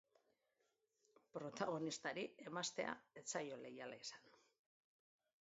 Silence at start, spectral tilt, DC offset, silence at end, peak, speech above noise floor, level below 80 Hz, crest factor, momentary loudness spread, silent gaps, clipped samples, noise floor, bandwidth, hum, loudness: 1.35 s; -3 dB/octave; under 0.1%; 1.1 s; -28 dBFS; 38 dB; under -90 dBFS; 22 dB; 9 LU; none; under 0.1%; -86 dBFS; 7.6 kHz; none; -48 LUFS